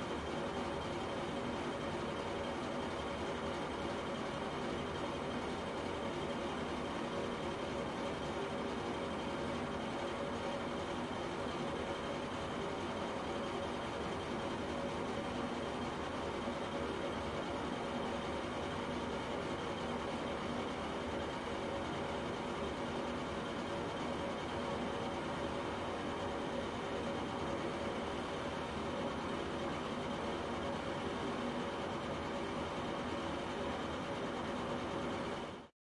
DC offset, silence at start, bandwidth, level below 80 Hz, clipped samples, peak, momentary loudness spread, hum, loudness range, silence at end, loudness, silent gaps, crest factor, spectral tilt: under 0.1%; 0 s; 11.5 kHz; -58 dBFS; under 0.1%; -26 dBFS; 1 LU; none; 0 LU; 0.3 s; -40 LUFS; none; 14 dB; -5 dB/octave